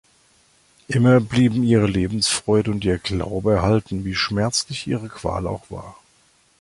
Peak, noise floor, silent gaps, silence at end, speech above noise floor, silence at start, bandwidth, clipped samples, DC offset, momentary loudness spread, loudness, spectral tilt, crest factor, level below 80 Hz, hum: -2 dBFS; -59 dBFS; none; 0.7 s; 39 dB; 0.9 s; 11.5 kHz; under 0.1%; under 0.1%; 11 LU; -20 LUFS; -5.5 dB/octave; 18 dB; -40 dBFS; none